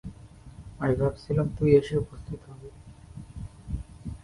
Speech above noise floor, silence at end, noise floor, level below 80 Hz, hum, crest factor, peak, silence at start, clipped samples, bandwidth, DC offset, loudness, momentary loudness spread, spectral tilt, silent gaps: 22 dB; 0.05 s; -48 dBFS; -44 dBFS; none; 22 dB; -6 dBFS; 0.05 s; under 0.1%; 11.5 kHz; under 0.1%; -27 LUFS; 25 LU; -8.5 dB/octave; none